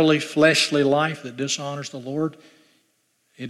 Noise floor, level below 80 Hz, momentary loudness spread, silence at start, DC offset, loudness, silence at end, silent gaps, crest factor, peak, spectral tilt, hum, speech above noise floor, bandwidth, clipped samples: -68 dBFS; -70 dBFS; 13 LU; 0 s; under 0.1%; -21 LUFS; 0 s; none; 18 dB; -4 dBFS; -4 dB/octave; none; 46 dB; 13.5 kHz; under 0.1%